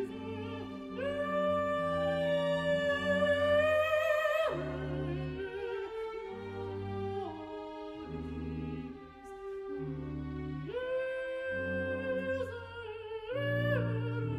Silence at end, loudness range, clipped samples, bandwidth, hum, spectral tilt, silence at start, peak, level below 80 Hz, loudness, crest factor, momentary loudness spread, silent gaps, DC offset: 0 s; 11 LU; under 0.1%; 13.5 kHz; none; -7 dB/octave; 0 s; -18 dBFS; -54 dBFS; -34 LUFS; 16 dB; 13 LU; none; under 0.1%